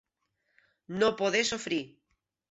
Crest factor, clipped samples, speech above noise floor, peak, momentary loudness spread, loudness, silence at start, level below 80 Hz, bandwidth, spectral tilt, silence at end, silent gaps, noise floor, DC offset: 20 dB; under 0.1%; 50 dB; -12 dBFS; 13 LU; -29 LUFS; 0.9 s; -70 dBFS; 8.2 kHz; -3 dB/octave; 0.65 s; none; -79 dBFS; under 0.1%